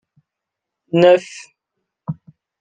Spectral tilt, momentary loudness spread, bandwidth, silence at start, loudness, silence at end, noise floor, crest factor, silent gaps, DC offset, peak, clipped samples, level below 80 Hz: -6.5 dB/octave; 23 LU; 9.2 kHz; 0.95 s; -14 LUFS; 0.45 s; -82 dBFS; 18 dB; none; under 0.1%; -2 dBFS; under 0.1%; -64 dBFS